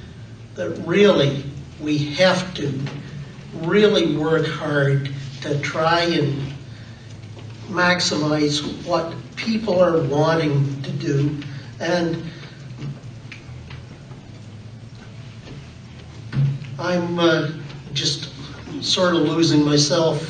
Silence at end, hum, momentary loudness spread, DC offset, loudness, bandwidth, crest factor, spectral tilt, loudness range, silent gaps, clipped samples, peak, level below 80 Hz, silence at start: 0 s; none; 22 LU; under 0.1%; -20 LUFS; 9.4 kHz; 18 dB; -5 dB/octave; 11 LU; none; under 0.1%; -4 dBFS; -50 dBFS; 0 s